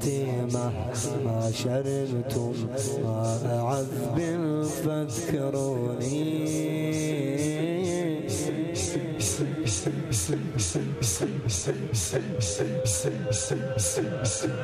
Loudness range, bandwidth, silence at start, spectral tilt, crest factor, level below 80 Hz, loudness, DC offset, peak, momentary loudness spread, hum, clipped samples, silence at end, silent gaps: 1 LU; 15 kHz; 0 s; -5 dB/octave; 16 dB; -52 dBFS; -28 LUFS; under 0.1%; -12 dBFS; 2 LU; none; under 0.1%; 0 s; none